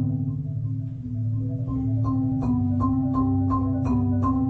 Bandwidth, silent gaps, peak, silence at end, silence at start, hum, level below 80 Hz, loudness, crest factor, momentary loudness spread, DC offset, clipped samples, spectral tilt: 4.3 kHz; none; -12 dBFS; 0 s; 0 s; none; -38 dBFS; -25 LUFS; 12 dB; 6 LU; under 0.1%; under 0.1%; -12 dB/octave